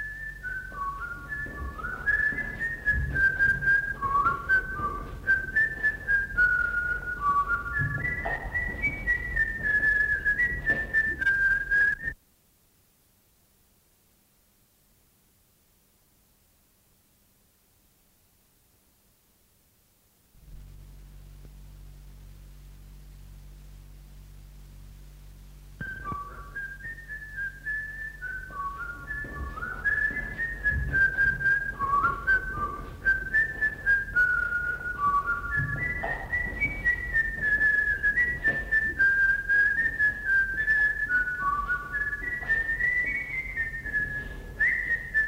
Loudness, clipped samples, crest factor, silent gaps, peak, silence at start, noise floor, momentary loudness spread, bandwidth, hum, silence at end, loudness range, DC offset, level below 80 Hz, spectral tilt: -26 LUFS; under 0.1%; 14 dB; none; -14 dBFS; 0 s; -65 dBFS; 13 LU; 16 kHz; none; 0 s; 12 LU; under 0.1%; -42 dBFS; -5.5 dB/octave